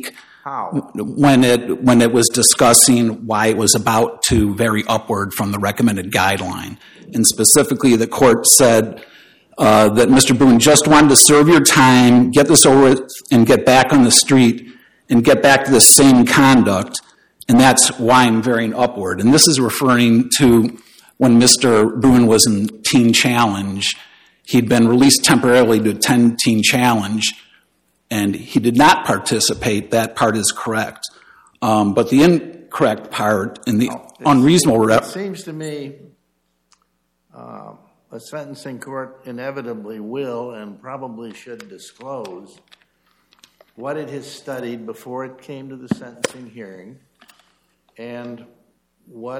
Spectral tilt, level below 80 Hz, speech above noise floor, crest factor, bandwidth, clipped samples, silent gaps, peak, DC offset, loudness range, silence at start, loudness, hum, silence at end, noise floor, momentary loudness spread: -3.5 dB/octave; -46 dBFS; 53 dB; 14 dB; 17 kHz; under 0.1%; none; 0 dBFS; under 0.1%; 21 LU; 0.05 s; -12 LUFS; none; 0 s; -67 dBFS; 21 LU